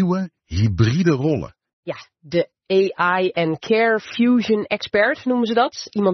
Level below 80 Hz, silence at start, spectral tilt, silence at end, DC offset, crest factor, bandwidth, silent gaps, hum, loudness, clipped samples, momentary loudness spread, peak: -50 dBFS; 0 s; -6.5 dB/octave; 0 s; under 0.1%; 16 dB; 6.4 kHz; 1.73-1.83 s; none; -19 LUFS; under 0.1%; 11 LU; -4 dBFS